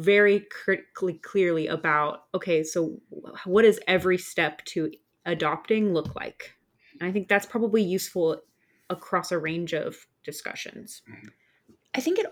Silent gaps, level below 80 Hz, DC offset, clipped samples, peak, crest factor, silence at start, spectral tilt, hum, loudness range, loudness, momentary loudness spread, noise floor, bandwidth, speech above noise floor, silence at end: none; -66 dBFS; under 0.1%; under 0.1%; -8 dBFS; 18 dB; 0 s; -5 dB/octave; none; 7 LU; -26 LUFS; 17 LU; -62 dBFS; 18.5 kHz; 36 dB; 0 s